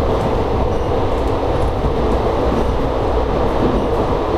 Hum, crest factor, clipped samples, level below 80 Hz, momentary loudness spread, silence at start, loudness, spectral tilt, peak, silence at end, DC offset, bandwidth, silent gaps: none; 12 dB; under 0.1%; -22 dBFS; 2 LU; 0 s; -18 LUFS; -7.5 dB/octave; -4 dBFS; 0 s; under 0.1%; 12.5 kHz; none